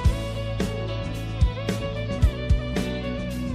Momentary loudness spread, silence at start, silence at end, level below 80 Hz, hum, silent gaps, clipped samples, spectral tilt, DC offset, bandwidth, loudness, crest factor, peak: 5 LU; 0 s; 0 s; -28 dBFS; none; none; under 0.1%; -6.5 dB/octave; under 0.1%; 15 kHz; -27 LUFS; 16 dB; -8 dBFS